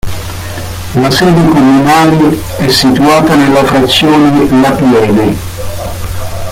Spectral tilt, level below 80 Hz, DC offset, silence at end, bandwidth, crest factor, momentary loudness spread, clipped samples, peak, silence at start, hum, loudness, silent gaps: -5.5 dB/octave; -28 dBFS; under 0.1%; 0 s; 16.5 kHz; 8 dB; 14 LU; under 0.1%; 0 dBFS; 0.05 s; none; -7 LUFS; none